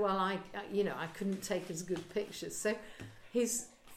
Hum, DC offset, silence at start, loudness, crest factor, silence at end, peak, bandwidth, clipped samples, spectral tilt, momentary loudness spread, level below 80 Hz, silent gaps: none; under 0.1%; 0 s; -37 LUFS; 16 dB; 0 s; -22 dBFS; 16.5 kHz; under 0.1%; -4 dB/octave; 7 LU; -66 dBFS; none